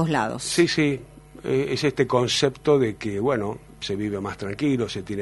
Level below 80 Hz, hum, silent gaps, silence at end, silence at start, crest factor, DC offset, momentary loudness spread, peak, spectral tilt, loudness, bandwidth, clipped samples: -52 dBFS; none; none; 0 s; 0 s; 18 dB; under 0.1%; 10 LU; -6 dBFS; -5 dB/octave; -24 LUFS; 11.5 kHz; under 0.1%